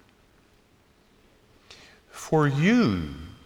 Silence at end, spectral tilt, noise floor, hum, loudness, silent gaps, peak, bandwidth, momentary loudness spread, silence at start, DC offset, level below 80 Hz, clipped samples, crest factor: 0.15 s; -6.5 dB/octave; -61 dBFS; none; -23 LUFS; none; -10 dBFS; 15.5 kHz; 20 LU; 2.15 s; under 0.1%; -52 dBFS; under 0.1%; 18 dB